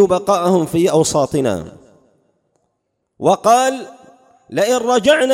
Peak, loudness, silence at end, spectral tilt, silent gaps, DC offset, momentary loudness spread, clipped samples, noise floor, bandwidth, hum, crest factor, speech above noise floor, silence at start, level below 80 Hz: -2 dBFS; -15 LUFS; 0 s; -4.5 dB/octave; none; under 0.1%; 13 LU; under 0.1%; -71 dBFS; 16.5 kHz; none; 16 dB; 57 dB; 0 s; -52 dBFS